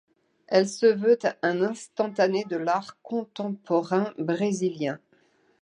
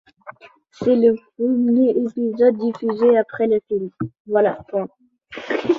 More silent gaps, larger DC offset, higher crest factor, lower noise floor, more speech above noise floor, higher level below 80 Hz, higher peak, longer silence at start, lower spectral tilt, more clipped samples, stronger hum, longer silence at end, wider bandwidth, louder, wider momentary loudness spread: second, none vs 4.20-4.25 s; neither; about the same, 20 dB vs 16 dB; first, -64 dBFS vs -48 dBFS; first, 39 dB vs 29 dB; second, -78 dBFS vs -60 dBFS; about the same, -6 dBFS vs -4 dBFS; first, 0.5 s vs 0.25 s; second, -5.5 dB/octave vs -8 dB/octave; neither; neither; first, 0.65 s vs 0 s; first, 10.5 kHz vs 6.8 kHz; second, -26 LUFS vs -19 LUFS; about the same, 10 LU vs 11 LU